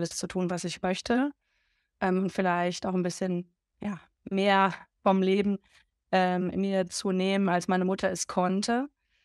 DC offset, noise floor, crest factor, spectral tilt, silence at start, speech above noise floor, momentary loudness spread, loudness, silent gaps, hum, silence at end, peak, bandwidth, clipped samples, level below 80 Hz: under 0.1%; -74 dBFS; 18 dB; -5 dB/octave; 0 s; 47 dB; 9 LU; -28 LUFS; none; none; 0.35 s; -10 dBFS; 12 kHz; under 0.1%; -64 dBFS